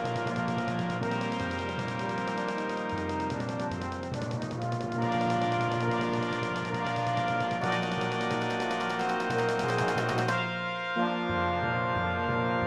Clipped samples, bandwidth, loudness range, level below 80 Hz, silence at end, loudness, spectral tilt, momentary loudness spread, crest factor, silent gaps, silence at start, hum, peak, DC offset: under 0.1%; 12 kHz; 3 LU; -58 dBFS; 0 s; -30 LUFS; -6 dB/octave; 5 LU; 14 dB; none; 0 s; none; -16 dBFS; under 0.1%